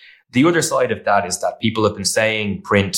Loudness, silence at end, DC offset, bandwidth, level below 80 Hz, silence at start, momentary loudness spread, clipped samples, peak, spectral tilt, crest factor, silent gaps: -18 LUFS; 0 s; under 0.1%; 17 kHz; -54 dBFS; 0.35 s; 6 LU; under 0.1%; -2 dBFS; -4 dB/octave; 16 dB; none